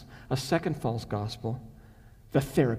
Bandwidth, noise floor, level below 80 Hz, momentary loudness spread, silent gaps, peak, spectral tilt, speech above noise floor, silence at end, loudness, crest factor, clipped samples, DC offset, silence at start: 16 kHz; -53 dBFS; -52 dBFS; 9 LU; none; -12 dBFS; -6.5 dB/octave; 24 dB; 0 s; -31 LUFS; 18 dB; under 0.1%; under 0.1%; 0 s